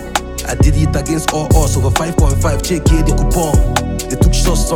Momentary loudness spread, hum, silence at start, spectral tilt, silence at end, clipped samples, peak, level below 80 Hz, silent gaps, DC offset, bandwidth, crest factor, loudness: 5 LU; none; 0 s; -5 dB/octave; 0 s; under 0.1%; 0 dBFS; -16 dBFS; none; under 0.1%; 18 kHz; 12 dB; -14 LUFS